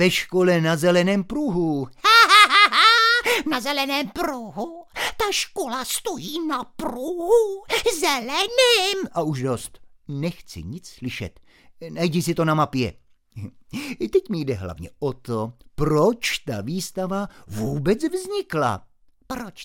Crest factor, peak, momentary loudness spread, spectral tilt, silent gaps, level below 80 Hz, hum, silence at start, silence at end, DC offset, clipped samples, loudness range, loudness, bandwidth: 22 dB; 0 dBFS; 20 LU; -4 dB/octave; none; -48 dBFS; none; 0 s; 0 s; under 0.1%; under 0.1%; 11 LU; -20 LUFS; 17 kHz